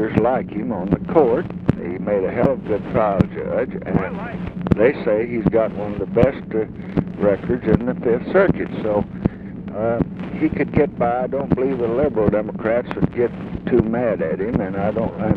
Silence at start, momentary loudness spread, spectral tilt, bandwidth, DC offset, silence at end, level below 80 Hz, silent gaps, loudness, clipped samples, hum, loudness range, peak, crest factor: 0 s; 8 LU; -10.5 dB/octave; 5.2 kHz; under 0.1%; 0 s; -38 dBFS; none; -20 LUFS; under 0.1%; none; 1 LU; -2 dBFS; 18 dB